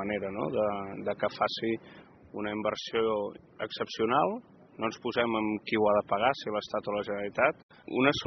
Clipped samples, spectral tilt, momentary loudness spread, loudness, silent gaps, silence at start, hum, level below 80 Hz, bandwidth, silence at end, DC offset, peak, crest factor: under 0.1%; -3 dB/octave; 10 LU; -31 LUFS; 7.63-7.69 s; 0 s; none; -66 dBFS; 6.4 kHz; 0 s; under 0.1%; -8 dBFS; 22 dB